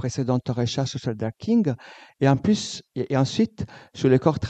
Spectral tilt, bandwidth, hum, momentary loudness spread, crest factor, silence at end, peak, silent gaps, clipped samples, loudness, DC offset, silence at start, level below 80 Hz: -6.5 dB/octave; 8.8 kHz; none; 11 LU; 18 dB; 0 s; -4 dBFS; none; under 0.1%; -24 LUFS; under 0.1%; 0 s; -56 dBFS